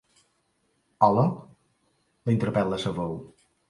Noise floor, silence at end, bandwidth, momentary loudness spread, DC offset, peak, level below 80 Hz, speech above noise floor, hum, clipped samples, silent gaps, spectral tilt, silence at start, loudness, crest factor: -71 dBFS; 0.45 s; 11.5 kHz; 14 LU; under 0.1%; -4 dBFS; -58 dBFS; 47 dB; none; under 0.1%; none; -7.5 dB/octave; 1 s; -25 LUFS; 24 dB